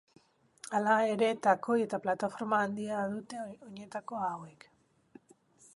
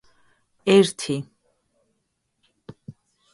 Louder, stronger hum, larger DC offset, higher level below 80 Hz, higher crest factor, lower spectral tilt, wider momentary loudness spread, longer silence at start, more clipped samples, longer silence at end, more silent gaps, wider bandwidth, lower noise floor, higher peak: second, -32 LUFS vs -21 LUFS; neither; neither; second, -80 dBFS vs -66 dBFS; about the same, 20 dB vs 20 dB; about the same, -5.5 dB/octave vs -5 dB/octave; second, 17 LU vs 26 LU; about the same, 0.65 s vs 0.65 s; neither; first, 1.25 s vs 0.45 s; neither; about the same, 11.5 kHz vs 11.5 kHz; second, -63 dBFS vs -74 dBFS; second, -12 dBFS vs -6 dBFS